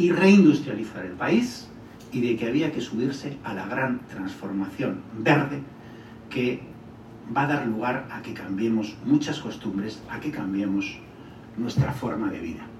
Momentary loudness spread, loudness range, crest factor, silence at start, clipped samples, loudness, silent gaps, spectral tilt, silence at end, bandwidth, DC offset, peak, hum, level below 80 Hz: 19 LU; 2 LU; 20 dB; 0 s; under 0.1%; -26 LUFS; none; -6.5 dB/octave; 0 s; 12.5 kHz; under 0.1%; -6 dBFS; none; -58 dBFS